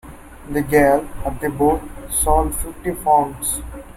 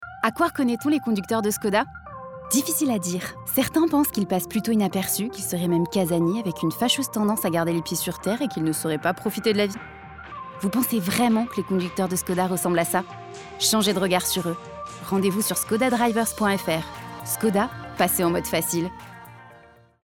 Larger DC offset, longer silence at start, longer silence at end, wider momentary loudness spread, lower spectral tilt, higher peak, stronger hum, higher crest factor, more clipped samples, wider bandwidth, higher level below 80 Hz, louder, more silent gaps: neither; about the same, 0.05 s vs 0 s; second, 0.05 s vs 0.45 s; about the same, 11 LU vs 13 LU; about the same, -5 dB/octave vs -4 dB/octave; first, -2 dBFS vs -6 dBFS; neither; about the same, 18 dB vs 18 dB; neither; second, 16.5 kHz vs over 20 kHz; first, -30 dBFS vs -56 dBFS; first, -19 LUFS vs -23 LUFS; neither